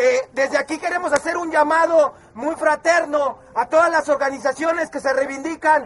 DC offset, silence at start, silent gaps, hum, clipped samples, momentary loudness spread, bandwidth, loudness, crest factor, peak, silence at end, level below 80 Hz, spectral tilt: under 0.1%; 0 s; none; none; under 0.1%; 7 LU; 11.5 kHz; -19 LUFS; 16 dB; -4 dBFS; 0 s; -58 dBFS; -3 dB/octave